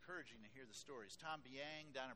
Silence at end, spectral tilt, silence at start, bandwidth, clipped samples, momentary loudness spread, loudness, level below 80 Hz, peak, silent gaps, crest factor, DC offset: 0 s; -3 dB/octave; 0 s; 13.5 kHz; under 0.1%; 7 LU; -54 LUFS; -82 dBFS; -34 dBFS; none; 20 dB; under 0.1%